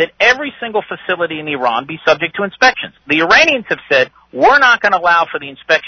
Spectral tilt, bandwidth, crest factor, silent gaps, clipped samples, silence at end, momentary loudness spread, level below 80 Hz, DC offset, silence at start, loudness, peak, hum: -3 dB/octave; 6.6 kHz; 14 dB; none; under 0.1%; 0 s; 11 LU; -52 dBFS; under 0.1%; 0 s; -13 LUFS; 0 dBFS; none